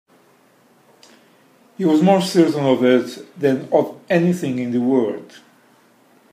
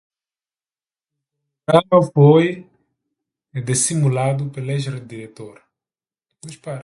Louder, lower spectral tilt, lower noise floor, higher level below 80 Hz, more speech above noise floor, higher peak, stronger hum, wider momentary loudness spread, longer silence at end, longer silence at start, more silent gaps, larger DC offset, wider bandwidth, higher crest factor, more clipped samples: about the same, -18 LUFS vs -17 LUFS; about the same, -6.5 dB/octave vs -6 dB/octave; second, -54 dBFS vs under -90 dBFS; second, -68 dBFS vs -60 dBFS; second, 37 dB vs over 73 dB; about the same, -2 dBFS vs 0 dBFS; neither; second, 8 LU vs 22 LU; first, 1.1 s vs 0 s; about the same, 1.8 s vs 1.7 s; neither; neither; first, 15.5 kHz vs 11.5 kHz; about the same, 18 dB vs 20 dB; neither